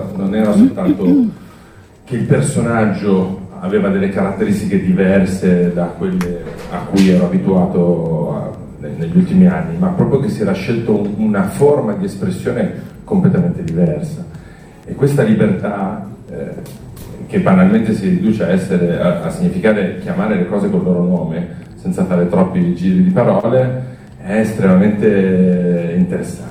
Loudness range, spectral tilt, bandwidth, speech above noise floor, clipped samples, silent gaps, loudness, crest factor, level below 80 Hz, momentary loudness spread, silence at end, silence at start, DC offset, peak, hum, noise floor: 3 LU; -8 dB/octave; 11 kHz; 27 dB; under 0.1%; none; -15 LUFS; 14 dB; -42 dBFS; 14 LU; 0 s; 0 s; under 0.1%; 0 dBFS; none; -40 dBFS